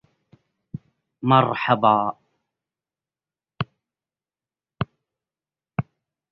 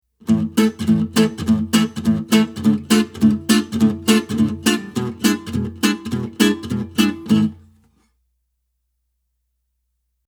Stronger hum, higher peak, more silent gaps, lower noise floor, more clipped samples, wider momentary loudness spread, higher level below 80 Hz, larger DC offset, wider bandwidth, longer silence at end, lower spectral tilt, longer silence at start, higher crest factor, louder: neither; about the same, -2 dBFS vs 0 dBFS; neither; first, under -90 dBFS vs -72 dBFS; neither; first, 22 LU vs 7 LU; second, -58 dBFS vs -50 dBFS; neither; second, 5.8 kHz vs over 20 kHz; second, 0.5 s vs 2.75 s; first, -9.5 dB/octave vs -5 dB/octave; first, 0.75 s vs 0.25 s; first, 24 dB vs 18 dB; second, -22 LUFS vs -18 LUFS